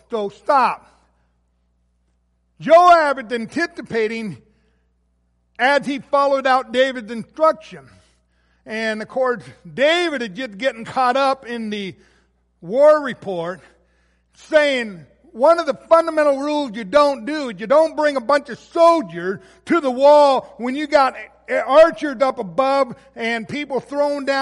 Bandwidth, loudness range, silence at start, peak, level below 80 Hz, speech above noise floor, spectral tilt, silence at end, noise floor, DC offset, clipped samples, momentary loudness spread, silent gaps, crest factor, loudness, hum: 11.5 kHz; 5 LU; 0.1 s; -2 dBFS; -58 dBFS; 47 dB; -4.5 dB/octave; 0 s; -64 dBFS; under 0.1%; under 0.1%; 14 LU; none; 16 dB; -18 LUFS; 60 Hz at -60 dBFS